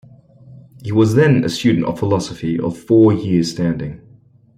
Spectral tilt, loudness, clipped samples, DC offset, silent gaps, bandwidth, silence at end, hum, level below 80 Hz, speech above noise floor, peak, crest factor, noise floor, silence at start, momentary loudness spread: -7 dB/octave; -16 LUFS; under 0.1%; under 0.1%; none; 14 kHz; 0.6 s; none; -50 dBFS; 33 dB; -2 dBFS; 14 dB; -48 dBFS; 0.5 s; 10 LU